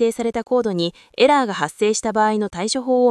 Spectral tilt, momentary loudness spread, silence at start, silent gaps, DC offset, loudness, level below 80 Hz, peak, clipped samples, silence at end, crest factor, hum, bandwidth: -4 dB/octave; 8 LU; 0 s; none; under 0.1%; -19 LUFS; -56 dBFS; -2 dBFS; under 0.1%; 0 s; 16 dB; none; 12 kHz